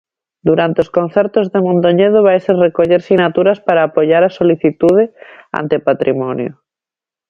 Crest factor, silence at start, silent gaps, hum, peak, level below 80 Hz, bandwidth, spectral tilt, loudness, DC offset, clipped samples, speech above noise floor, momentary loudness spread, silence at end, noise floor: 12 dB; 0.45 s; none; none; 0 dBFS; -54 dBFS; 7 kHz; -8.5 dB/octave; -13 LUFS; under 0.1%; under 0.1%; 76 dB; 8 LU; 0.8 s; -88 dBFS